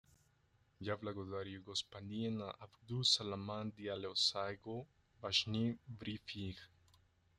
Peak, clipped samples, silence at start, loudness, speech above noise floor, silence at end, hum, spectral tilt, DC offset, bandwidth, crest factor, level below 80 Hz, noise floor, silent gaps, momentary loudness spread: -20 dBFS; under 0.1%; 0.8 s; -40 LUFS; 33 dB; 0.7 s; none; -4 dB/octave; under 0.1%; 12.5 kHz; 22 dB; -74 dBFS; -75 dBFS; none; 14 LU